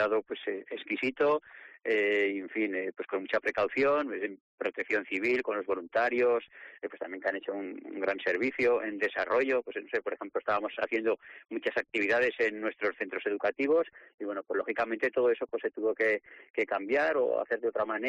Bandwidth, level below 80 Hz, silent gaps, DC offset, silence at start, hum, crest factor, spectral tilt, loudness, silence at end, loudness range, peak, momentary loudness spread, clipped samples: 8 kHz; -72 dBFS; 4.40-4.58 s, 14.14-14.18 s, 16.50-16.54 s; under 0.1%; 0 s; none; 12 dB; -5 dB/octave; -31 LUFS; 0 s; 2 LU; -18 dBFS; 10 LU; under 0.1%